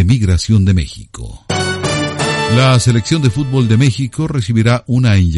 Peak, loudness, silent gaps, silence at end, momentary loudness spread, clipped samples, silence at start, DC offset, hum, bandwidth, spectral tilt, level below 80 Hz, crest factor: 0 dBFS; -13 LUFS; none; 0 s; 8 LU; under 0.1%; 0 s; under 0.1%; none; 11.5 kHz; -5.5 dB/octave; -30 dBFS; 12 dB